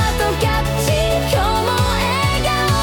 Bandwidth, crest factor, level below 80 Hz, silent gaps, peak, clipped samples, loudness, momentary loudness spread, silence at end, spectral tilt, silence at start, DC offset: 19 kHz; 12 dB; -26 dBFS; none; -4 dBFS; under 0.1%; -17 LUFS; 1 LU; 0 s; -4.5 dB/octave; 0 s; under 0.1%